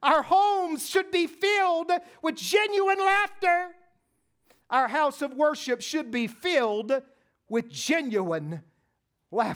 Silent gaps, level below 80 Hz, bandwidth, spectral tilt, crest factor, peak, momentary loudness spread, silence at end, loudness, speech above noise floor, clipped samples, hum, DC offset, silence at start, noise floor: none; -72 dBFS; over 20 kHz; -3.5 dB/octave; 18 dB; -8 dBFS; 9 LU; 0 s; -26 LUFS; 50 dB; under 0.1%; none; under 0.1%; 0 s; -76 dBFS